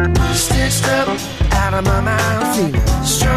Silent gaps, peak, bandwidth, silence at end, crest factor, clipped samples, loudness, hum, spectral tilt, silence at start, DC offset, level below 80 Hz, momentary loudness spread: none; -4 dBFS; 15.5 kHz; 0 s; 10 dB; under 0.1%; -16 LUFS; none; -4.5 dB/octave; 0 s; under 0.1%; -22 dBFS; 2 LU